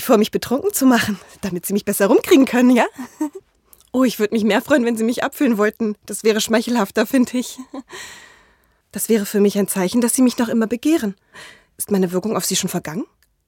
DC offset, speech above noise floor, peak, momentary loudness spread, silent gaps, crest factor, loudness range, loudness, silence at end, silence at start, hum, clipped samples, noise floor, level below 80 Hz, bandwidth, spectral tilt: under 0.1%; 40 dB; -2 dBFS; 14 LU; none; 18 dB; 4 LU; -18 LUFS; 0.45 s; 0 s; none; under 0.1%; -58 dBFS; -58 dBFS; 17 kHz; -4.5 dB/octave